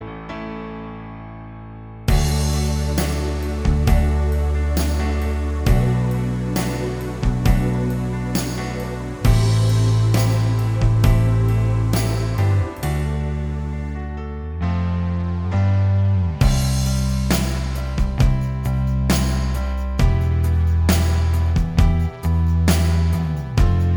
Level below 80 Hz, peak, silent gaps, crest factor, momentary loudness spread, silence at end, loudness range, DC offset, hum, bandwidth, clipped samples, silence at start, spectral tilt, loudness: -24 dBFS; -2 dBFS; none; 16 dB; 10 LU; 0 s; 4 LU; under 0.1%; none; over 20 kHz; under 0.1%; 0 s; -6.5 dB/octave; -20 LUFS